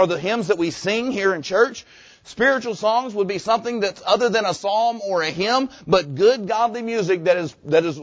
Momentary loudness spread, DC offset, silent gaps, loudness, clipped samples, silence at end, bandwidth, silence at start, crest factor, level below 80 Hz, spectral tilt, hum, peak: 4 LU; under 0.1%; none; -20 LUFS; under 0.1%; 0 s; 8 kHz; 0 s; 18 dB; -58 dBFS; -4.5 dB/octave; none; -4 dBFS